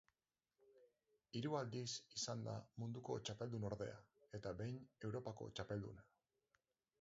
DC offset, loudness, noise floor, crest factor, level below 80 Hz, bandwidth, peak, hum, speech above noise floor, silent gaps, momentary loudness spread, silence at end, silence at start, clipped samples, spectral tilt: under 0.1%; -49 LUFS; under -90 dBFS; 20 dB; -74 dBFS; 7.6 kHz; -30 dBFS; none; over 42 dB; none; 8 LU; 1 s; 0.65 s; under 0.1%; -5.5 dB/octave